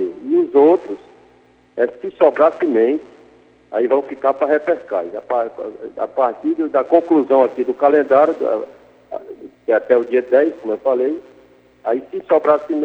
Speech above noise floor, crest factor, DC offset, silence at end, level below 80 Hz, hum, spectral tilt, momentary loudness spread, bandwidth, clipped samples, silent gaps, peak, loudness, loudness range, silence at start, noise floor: 36 dB; 18 dB; under 0.1%; 0 s; -66 dBFS; 60 Hz at -65 dBFS; -7.5 dB/octave; 16 LU; 5.6 kHz; under 0.1%; none; 0 dBFS; -17 LUFS; 3 LU; 0 s; -52 dBFS